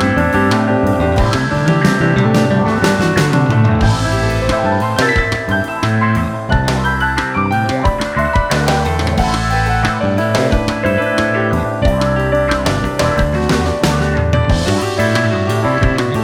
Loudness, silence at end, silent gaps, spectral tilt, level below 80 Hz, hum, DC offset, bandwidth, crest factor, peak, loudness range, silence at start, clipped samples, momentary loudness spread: -14 LUFS; 0 s; none; -6 dB/octave; -24 dBFS; none; under 0.1%; 16.5 kHz; 14 dB; 0 dBFS; 2 LU; 0 s; under 0.1%; 3 LU